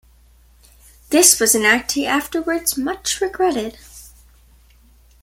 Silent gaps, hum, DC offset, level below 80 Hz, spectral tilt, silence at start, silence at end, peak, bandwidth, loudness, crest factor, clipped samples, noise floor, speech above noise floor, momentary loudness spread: none; none; under 0.1%; -48 dBFS; -1 dB/octave; 1.1 s; 1.15 s; 0 dBFS; 17 kHz; -16 LUFS; 20 dB; under 0.1%; -51 dBFS; 33 dB; 11 LU